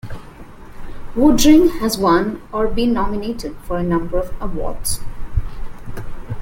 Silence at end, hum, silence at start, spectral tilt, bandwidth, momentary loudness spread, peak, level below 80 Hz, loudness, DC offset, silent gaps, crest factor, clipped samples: 0 s; none; 0.05 s; -5 dB/octave; 16.5 kHz; 22 LU; -2 dBFS; -28 dBFS; -18 LUFS; under 0.1%; none; 16 dB; under 0.1%